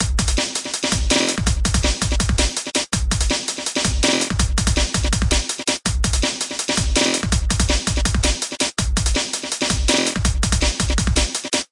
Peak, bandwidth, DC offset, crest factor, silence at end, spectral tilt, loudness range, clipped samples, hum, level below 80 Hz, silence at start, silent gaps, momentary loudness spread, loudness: -4 dBFS; 11.5 kHz; under 0.1%; 16 dB; 0.05 s; -3 dB/octave; 0 LU; under 0.1%; none; -24 dBFS; 0 s; none; 4 LU; -19 LUFS